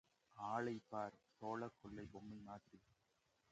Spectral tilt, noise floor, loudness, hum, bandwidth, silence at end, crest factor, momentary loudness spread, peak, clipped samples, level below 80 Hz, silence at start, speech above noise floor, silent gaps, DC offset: -6.5 dB/octave; -83 dBFS; -50 LUFS; none; 8.8 kHz; 0.75 s; 22 dB; 12 LU; -30 dBFS; under 0.1%; -78 dBFS; 0.35 s; 32 dB; none; under 0.1%